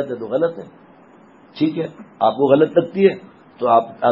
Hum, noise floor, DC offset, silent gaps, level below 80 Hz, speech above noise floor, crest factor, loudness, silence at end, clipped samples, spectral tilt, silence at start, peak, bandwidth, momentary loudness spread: none; -47 dBFS; under 0.1%; none; -66 dBFS; 30 dB; 18 dB; -18 LUFS; 0 s; under 0.1%; -9 dB/octave; 0 s; 0 dBFS; 5.8 kHz; 13 LU